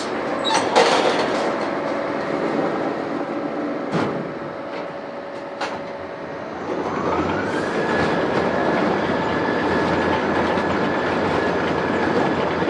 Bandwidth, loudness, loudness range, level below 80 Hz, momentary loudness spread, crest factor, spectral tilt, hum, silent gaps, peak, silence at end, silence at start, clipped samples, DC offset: 11.5 kHz; -22 LUFS; 7 LU; -54 dBFS; 10 LU; 20 dB; -5 dB/octave; none; none; -2 dBFS; 0 s; 0 s; under 0.1%; under 0.1%